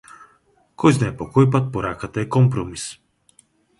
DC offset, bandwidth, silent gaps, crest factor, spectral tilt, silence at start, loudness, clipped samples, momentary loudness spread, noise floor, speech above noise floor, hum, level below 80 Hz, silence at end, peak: under 0.1%; 11.5 kHz; none; 20 dB; -7 dB/octave; 0.8 s; -20 LUFS; under 0.1%; 12 LU; -59 dBFS; 41 dB; none; -48 dBFS; 0.85 s; -2 dBFS